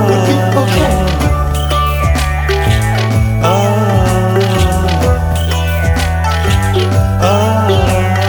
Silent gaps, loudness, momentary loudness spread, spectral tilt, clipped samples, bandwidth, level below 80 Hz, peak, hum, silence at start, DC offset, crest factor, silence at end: none; -12 LUFS; 3 LU; -6 dB/octave; under 0.1%; 19.5 kHz; -18 dBFS; 0 dBFS; none; 0 s; under 0.1%; 10 dB; 0 s